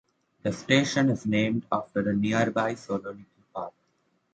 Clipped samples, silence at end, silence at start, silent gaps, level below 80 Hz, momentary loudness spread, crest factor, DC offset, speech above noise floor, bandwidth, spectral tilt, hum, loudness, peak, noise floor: under 0.1%; 0.65 s; 0.45 s; none; -62 dBFS; 16 LU; 22 dB; under 0.1%; 45 dB; 9 kHz; -5.5 dB/octave; none; -26 LUFS; -6 dBFS; -71 dBFS